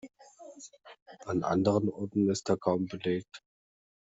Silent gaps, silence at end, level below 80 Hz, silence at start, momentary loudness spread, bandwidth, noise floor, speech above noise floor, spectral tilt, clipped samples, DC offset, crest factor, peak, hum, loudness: 1.02-1.06 s; 0.65 s; -68 dBFS; 0.05 s; 22 LU; 8.2 kHz; -51 dBFS; 22 dB; -6.5 dB/octave; under 0.1%; under 0.1%; 20 dB; -12 dBFS; none; -30 LUFS